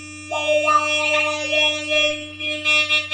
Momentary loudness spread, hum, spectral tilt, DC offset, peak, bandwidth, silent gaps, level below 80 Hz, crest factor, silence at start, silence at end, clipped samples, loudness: 8 LU; none; -1.5 dB/octave; under 0.1%; -6 dBFS; 11 kHz; none; -64 dBFS; 14 dB; 0 s; 0 s; under 0.1%; -18 LUFS